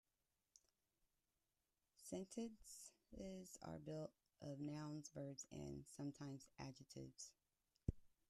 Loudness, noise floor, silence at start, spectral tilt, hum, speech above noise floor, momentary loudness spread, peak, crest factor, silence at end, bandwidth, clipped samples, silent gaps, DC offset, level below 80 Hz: -55 LUFS; under -90 dBFS; 0.55 s; -5.5 dB/octave; none; over 36 dB; 8 LU; -28 dBFS; 28 dB; 0.2 s; 13.5 kHz; under 0.1%; none; under 0.1%; -68 dBFS